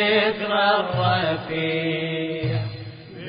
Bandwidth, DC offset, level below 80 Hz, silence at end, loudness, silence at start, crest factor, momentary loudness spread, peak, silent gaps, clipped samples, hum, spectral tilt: 5.2 kHz; under 0.1%; -54 dBFS; 0 s; -22 LUFS; 0 s; 16 dB; 10 LU; -6 dBFS; none; under 0.1%; none; -10.5 dB/octave